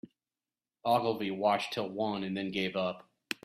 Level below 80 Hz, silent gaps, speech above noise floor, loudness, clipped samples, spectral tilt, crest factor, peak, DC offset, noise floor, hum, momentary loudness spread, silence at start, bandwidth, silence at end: -74 dBFS; none; over 58 dB; -33 LUFS; under 0.1%; -5.5 dB/octave; 22 dB; -12 dBFS; under 0.1%; under -90 dBFS; none; 8 LU; 0.05 s; 15.5 kHz; 0.1 s